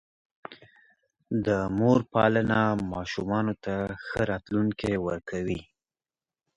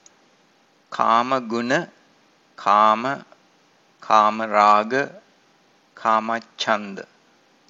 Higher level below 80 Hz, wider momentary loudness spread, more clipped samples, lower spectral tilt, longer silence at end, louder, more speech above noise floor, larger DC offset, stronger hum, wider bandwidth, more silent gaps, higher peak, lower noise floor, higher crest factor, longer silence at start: first, -52 dBFS vs -72 dBFS; second, 11 LU vs 15 LU; neither; first, -7.5 dB/octave vs -4 dB/octave; first, 0.95 s vs 0.65 s; second, -27 LUFS vs -20 LUFS; first, over 64 dB vs 39 dB; neither; neither; first, 10.5 kHz vs 7.8 kHz; neither; second, -8 dBFS vs 0 dBFS; first, under -90 dBFS vs -59 dBFS; about the same, 22 dB vs 22 dB; second, 0.5 s vs 0.9 s